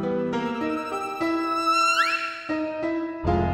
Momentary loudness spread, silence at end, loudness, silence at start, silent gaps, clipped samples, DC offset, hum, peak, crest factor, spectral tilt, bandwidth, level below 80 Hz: 9 LU; 0 s; -24 LUFS; 0 s; none; under 0.1%; under 0.1%; none; -8 dBFS; 16 dB; -5 dB/octave; 16 kHz; -42 dBFS